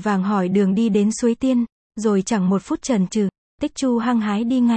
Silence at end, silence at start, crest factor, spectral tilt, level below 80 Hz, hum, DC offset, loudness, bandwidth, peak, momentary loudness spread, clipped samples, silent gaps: 0 s; 0 s; 12 dB; -6 dB/octave; -54 dBFS; none; under 0.1%; -20 LUFS; 8.8 kHz; -6 dBFS; 6 LU; under 0.1%; 1.72-1.90 s, 3.38-3.58 s